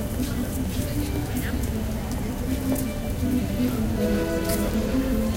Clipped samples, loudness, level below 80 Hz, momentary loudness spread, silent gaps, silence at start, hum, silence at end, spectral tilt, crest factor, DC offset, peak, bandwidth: under 0.1%; -26 LUFS; -32 dBFS; 5 LU; none; 0 s; none; 0 s; -6 dB/octave; 14 dB; under 0.1%; -12 dBFS; 17 kHz